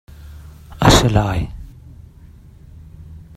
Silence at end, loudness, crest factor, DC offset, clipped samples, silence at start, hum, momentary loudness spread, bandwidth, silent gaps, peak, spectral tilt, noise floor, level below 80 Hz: 0.2 s; -15 LUFS; 20 dB; under 0.1%; under 0.1%; 0.25 s; none; 27 LU; 15.5 kHz; none; 0 dBFS; -5 dB/octave; -42 dBFS; -30 dBFS